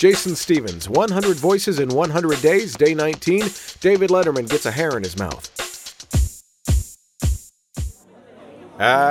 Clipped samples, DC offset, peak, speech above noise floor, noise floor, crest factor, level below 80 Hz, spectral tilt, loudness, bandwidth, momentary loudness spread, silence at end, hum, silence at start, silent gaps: under 0.1%; under 0.1%; 0 dBFS; 29 dB; -47 dBFS; 18 dB; -32 dBFS; -5 dB/octave; -20 LUFS; 16.5 kHz; 14 LU; 0 s; none; 0 s; none